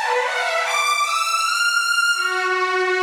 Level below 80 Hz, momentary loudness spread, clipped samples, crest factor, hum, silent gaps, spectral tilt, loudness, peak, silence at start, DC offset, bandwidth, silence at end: -86 dBFS; 3 LU; under 0.1%; 12 dB; none; none; 3 dB/octave; -18 LUFS; -8 dBFS; 0 s; under 0.1%; 18.5 kHz; 0 s